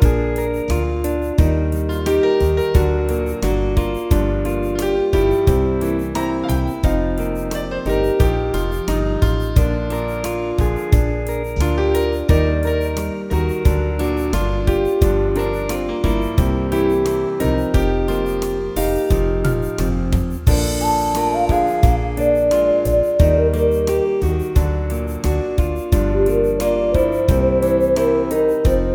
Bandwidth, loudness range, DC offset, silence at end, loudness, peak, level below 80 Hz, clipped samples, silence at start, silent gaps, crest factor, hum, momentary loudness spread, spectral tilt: over 20 kHz; 3 LU; under 0.1%; 0 s; -18 LUFS; 0 dBFS; -22 dBFS; under 0.1%; 0 s; none; 16 dB; none; 5 LU; -7 dB/octave